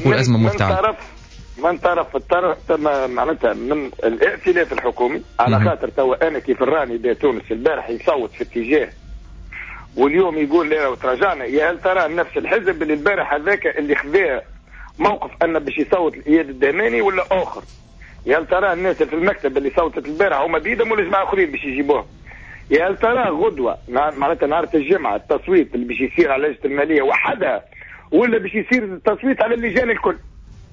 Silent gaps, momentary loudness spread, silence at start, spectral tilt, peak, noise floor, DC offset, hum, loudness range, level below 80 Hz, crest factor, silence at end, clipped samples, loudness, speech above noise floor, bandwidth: none; 6 LU; 0 s; -7 dB/octave; -4 dBFS; -38 dBFS; under 0.1%; none; 2 LU; -42 dBFS; 14 dB; 0.1 s; under 0.1%; -18 LUFS; 20 dB; 7.6 kHz